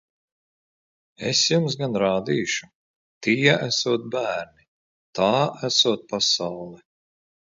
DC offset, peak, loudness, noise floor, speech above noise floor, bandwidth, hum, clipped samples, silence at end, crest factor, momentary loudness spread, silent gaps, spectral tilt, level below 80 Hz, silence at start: under 0.1%; -2 dBFS; -22 LUFS; under -90 dBFS; over 67 dB; 7.8 kHz; none; under 0.1%; 0.8 s; 22 dB; 13 LU; 2.75-3.21 s, 4.68-5.13 s; -3.5 dB/octave; -64 dBFS; 1.2 s